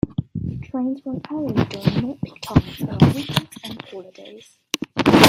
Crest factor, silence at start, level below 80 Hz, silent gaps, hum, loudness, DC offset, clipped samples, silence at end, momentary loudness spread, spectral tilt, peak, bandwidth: 20 dB; 0.05 s; -44 dBFS; none; none; -22 LUFS; under 0.1%; under 0.1%; 0 s; 18 LU; -5.5 dB/octave; 0 dBFS; 16 kHz